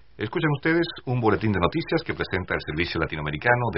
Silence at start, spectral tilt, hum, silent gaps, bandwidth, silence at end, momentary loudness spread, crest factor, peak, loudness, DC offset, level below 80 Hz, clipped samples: 0.2 s; -4.5 dB/octave; none; none; 5.8 kHz; 0 s; 6 LU; 22 dB; -4 dBFS; -25 LUFS; 0.3%; -46 dBFS; under 0.1%